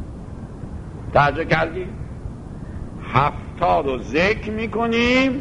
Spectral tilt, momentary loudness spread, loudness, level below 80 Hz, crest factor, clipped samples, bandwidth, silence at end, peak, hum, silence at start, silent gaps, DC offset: -6.5 dB/octave; 17 LU; -20 LUFS; -36 dBFS; 20 dB; under 0.1%; 10.5 kHz; 0 s; -2 dBFS; none; 0 s; none; under 0.1%